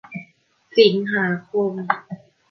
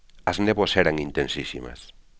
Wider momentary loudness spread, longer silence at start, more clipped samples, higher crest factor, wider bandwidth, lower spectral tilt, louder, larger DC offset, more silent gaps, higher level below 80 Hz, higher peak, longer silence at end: first, 21 LU vs 14 LU; about the same, 0.1 s vs 0.15 s; neither; about the same, 20 dB vs 22 dB; second, 6 kHz vs 8 kHz; first, -7 dB/octave vs -5 dB/octave; first, -20 LUFS vs -24 LUFS; second, under 0.1% vs 0.2%; neither; second, -70 dBFS vs -44 dBFS; about the same, -2 dBFS vs -4 dBFS; about the same, 0.35 s vs 0.3 s